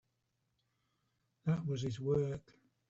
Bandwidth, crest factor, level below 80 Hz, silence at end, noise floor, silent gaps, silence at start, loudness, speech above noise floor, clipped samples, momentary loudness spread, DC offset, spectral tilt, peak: 8 kHz; 18 dB; -68 dBFS; 0.5 s; -83 dBFS; none; 1.45 s; -37 LUFS; 47 dB; under 0.1%; 7 LU; under 0.1%; -8 dB/octave; -22 dBFS